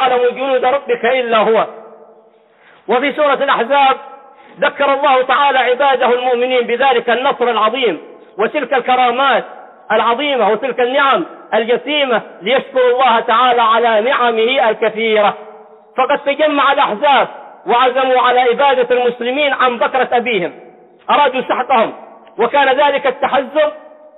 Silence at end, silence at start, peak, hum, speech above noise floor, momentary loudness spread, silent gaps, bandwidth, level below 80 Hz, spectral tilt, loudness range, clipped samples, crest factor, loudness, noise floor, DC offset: 0.4 s; 0 s; -2 dBFS; none; 35 dB; 7 LU; none; 4.1 kHz; -64 dBFS; -7.5 dB/octave; 3 LU; under 0.1%; 12 dB; -13 LUFS; -48 dBFS; under 0.1%